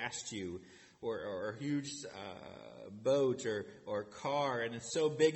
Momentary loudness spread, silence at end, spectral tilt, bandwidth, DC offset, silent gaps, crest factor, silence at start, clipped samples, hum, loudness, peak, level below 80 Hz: 16 LU; 0 s; -4.5 dB/octave; 8.4 kHz; under 0.1%; none; 20 dB; 0 s; under 0.1%; none; -38 LUFS; -18 dBFS; -74 dBFS